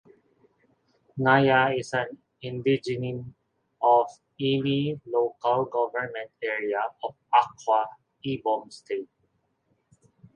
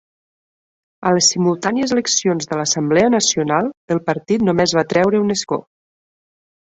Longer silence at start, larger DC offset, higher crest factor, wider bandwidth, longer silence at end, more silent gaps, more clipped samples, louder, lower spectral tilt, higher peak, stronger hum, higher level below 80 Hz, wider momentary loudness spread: first, 1.15 s vs 1 s; neither; about the same, 20 dB vs 16 dB; first, 10 kHz vs 8.4 kHz; first, 1.3 s vs 1.05 s; second, none vs 3.77-3.88 s; neither; second, -26 LUFS vs -17 LUFS; first, -6.5 dB/octave vs -3.5 dB/octave; second, -6 dBFS vs -2 dBFS; neither; second, -68 dBFS vs -56 dBFS; first, 15 LU vs 7 LU